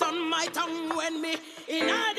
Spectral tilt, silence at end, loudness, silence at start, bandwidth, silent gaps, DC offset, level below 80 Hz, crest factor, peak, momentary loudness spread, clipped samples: -1.5 dB/octave; 0 s; -29 LUFS; 0 s; 15.5 kHz; none; under 0.1%; -76 dBFS; 18 dB; -12 dBFS; 6 LU; under 0.1%